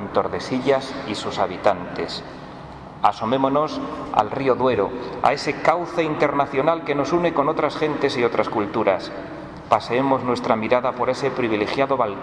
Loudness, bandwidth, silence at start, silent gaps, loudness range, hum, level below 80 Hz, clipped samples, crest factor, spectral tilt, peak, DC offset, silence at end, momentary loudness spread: -21 LUFS; 10.5 kHz; 0 s; none; 3 LU; none; -52 dBFS; under 0.1%; 18 dB; -6 dB/octave; -2 dBFS; under 0.1%; 0 s; 9 LU